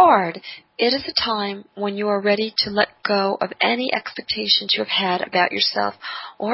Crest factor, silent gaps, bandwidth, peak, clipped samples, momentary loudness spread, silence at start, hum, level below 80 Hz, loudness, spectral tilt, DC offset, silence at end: 18 dB; none; 6 kHz; -2 dBFS; under 0.1%; 10 LU; 0 s; none; -60 dBFS; -20 LUFS; -7 dB/octave; under 0.1%; 0 s